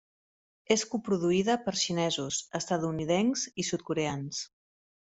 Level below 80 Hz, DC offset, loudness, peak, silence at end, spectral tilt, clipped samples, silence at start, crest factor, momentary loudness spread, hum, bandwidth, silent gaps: -66 dBFS; under 0.1%; -30 LUFS; -8 dBFS; 0.7 s; -4 dB/octave; under 0.1%; 0.7 s; 22 dB; 6 LU; none; 8.2 kHz; none